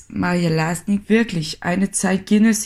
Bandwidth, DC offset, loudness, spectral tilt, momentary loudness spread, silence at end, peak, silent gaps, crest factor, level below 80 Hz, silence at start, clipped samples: 15 kHz; 0.1%; -19 LUFS; -5 dB/octave; 6 LU; 0 s; -4 dBFS; none; 14 dB; -48 dBFS; 0.1 s; under 0.1%